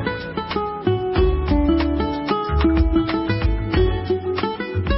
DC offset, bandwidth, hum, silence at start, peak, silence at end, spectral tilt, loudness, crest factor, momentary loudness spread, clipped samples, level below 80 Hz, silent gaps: under 0.1%; 5.8 kHz; none; 0 s; -6 dBFS; 0 s; -11.5 dB/octave; -21 LUFS; 12 dB; 6 LU; under 0.1%; -24 dBFS; none